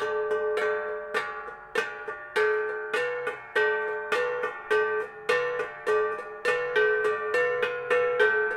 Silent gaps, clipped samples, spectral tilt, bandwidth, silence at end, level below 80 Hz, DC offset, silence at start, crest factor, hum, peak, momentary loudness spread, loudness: none; under 0.1%; -2.5 dB/octave; 12.5 kHz; 0 s; -68 dBFS; under 0.1%; 0 s; 16 dB; none; -10 dBFS; 7 LU; -27 LUFS